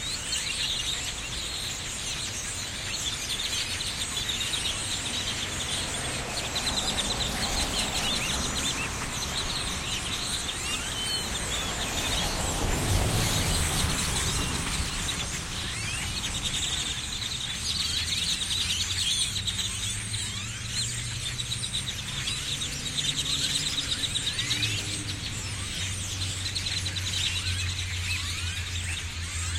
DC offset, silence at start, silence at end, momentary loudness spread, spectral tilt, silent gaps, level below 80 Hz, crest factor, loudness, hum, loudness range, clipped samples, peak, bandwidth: under 0.1%; 0 s; 0 s; 5 LU; -2 dB/octave; none; -40 dBFS; 18 dB; -28 LUFS; none; 3 LU; under 0.1%; -12 dBFS; 16.5 kHz